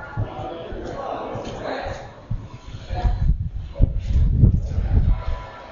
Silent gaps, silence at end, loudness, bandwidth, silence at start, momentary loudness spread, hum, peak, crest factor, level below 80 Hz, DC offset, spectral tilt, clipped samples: none; 0 s; -25 LUFS; 7.2 kHz; 0 s; 15 LU; none; -2 dBFS; 20 dB; -24 dBFS; under 0.1%; -8.5 dB/octave; under 0.1%